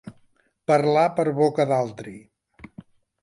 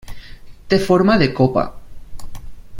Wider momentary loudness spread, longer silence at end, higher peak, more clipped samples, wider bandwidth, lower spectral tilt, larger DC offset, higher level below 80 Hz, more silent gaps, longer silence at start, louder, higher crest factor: first, 16 LU vs 8 LU; first, 1.05 s vs 0 s; second, -6 dBFS vs 0 dBFS; neither; second, 11.5 kHz vs 16.5 kHz; about the same, -7 dB/octave vs -7 dB/octave; neither; second, -64 dBFS vs -36 dBFS; neither; about the same, 0.05 s vs 0.05 s; second, -21 LUFS vs -16 LUFS; about the same, 18 dB vs 18 dB